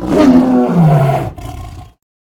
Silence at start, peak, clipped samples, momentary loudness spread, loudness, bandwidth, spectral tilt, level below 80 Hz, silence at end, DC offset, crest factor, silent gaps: 0 s; 0 dBFS; 0.1%; 20 LU; -10 LUFS; 16.5 kHz; -8.5 dB/octave; -34 dBFS; 0.4 s; under 0.1%; 12 dB; none